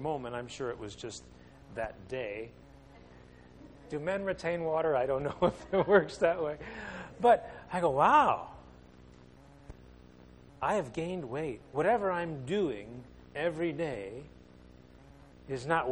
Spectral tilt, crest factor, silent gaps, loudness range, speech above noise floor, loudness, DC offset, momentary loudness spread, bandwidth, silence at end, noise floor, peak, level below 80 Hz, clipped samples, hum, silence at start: -6 dB/octave; 24 dB; none; 12 LU; 24 dB; -32 LUFS; under 0.1%; 17 LU; 10.5 kHz; 0 s; -56 dBFS; -10 dBFS; -58 dBFS; under 0.1%; none; 0 s